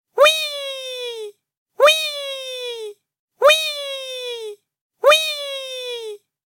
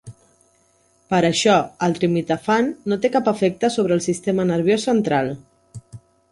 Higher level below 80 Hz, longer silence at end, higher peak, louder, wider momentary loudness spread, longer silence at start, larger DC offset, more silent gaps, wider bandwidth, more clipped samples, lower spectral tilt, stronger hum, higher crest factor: second, -76 dBFS vs -56 dBFS; about the same, 0.3 s vs 0.35 s; about the same, -2 dBFS vs -4 dBFS; about the same, -19 LUFS vs -19 LUFS; first, 18 LU vs 6 LU; about the same, 0.15 s vs 0.05 s; neither; first, 1.57-1.66 s, 3.19-3.28 s, 4.81-4.90 s vs none; first, 17 kHz vs 11.5 kHz; neither; second, 2.5 dB/octave vs -5 dB/octave; neither; about the same, 18 dB vs 16 dB